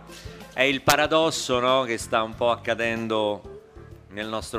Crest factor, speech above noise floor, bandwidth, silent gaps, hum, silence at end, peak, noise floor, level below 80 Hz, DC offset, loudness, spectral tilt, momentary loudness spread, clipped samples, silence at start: 22 dB; 22 dB; 15.5 kHz; none; none; 0 s; -2 dBFS; -46 dBFS; -52 dBFS; under 0.1%; -23 LUFS; -3.5 dB/octave; 17 LU; under 0.1%; 0 s